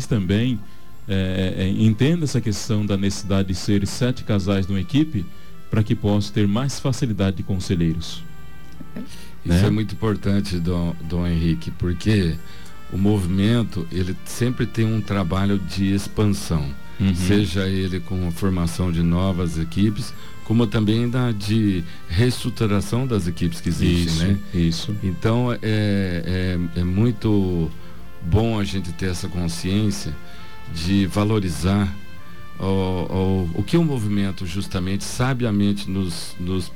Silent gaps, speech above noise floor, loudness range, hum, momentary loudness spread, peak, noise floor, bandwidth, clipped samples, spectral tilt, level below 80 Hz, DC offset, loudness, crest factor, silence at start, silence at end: none; 21 dB; 2 LU; none; 10 LU; -8 dBFS; -42 dBFS; 16.5 kHz; under 0.1%; -6.5 dB/octave; -38 dBFS; 3%; -22 LUFS; 14 dB; 0 s; 0 s